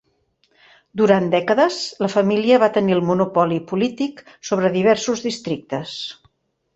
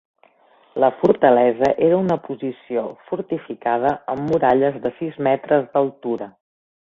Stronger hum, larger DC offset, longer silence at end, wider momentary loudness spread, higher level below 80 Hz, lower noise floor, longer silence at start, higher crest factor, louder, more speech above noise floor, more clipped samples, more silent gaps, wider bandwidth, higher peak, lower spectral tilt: neither; neither; about the same, 0.65 s vs 0.55 s; about the same, 12 LU vs 12 LU; about the same, -62 dBFS vs -58 dBFS; first, -65 dBFS vs -55 dBFS; first, 0.95 s vs 0.75 s; about the same, 18 dB vs 18 dB; about the same, -19 LUFS vs -20 LUFS; first, 46 dB vs 36 dB; neither; neither; first, 8.2 kHz vs 7.2 kHz; about the same, -2 dBFS vs -2 dBFS; second, -5.5 dB/octave vs -8.5 dB/octave